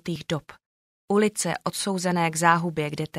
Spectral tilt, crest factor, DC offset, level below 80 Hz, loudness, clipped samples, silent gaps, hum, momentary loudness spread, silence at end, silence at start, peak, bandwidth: -4.5 dB/octave; 22 dB; under 0.1%; -62 dBFS; -25 LUFS; under 0.1%; 0.66-1.08 s; none; 9 LU; 0 s; 0.05 s; -4 dBFS; 16 kHz